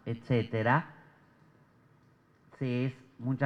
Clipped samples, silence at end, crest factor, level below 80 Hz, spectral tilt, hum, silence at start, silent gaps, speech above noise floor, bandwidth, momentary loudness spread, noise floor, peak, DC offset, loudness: under 0.1%; 0 s; 22 dB; -72 dBFS; -9 dB/octave; none; 0.05 s; none; 34 dB; 6.2 kHz; 11 LU; -64 dBFS; -12 dBFS; under 0.1%; -32 LUFS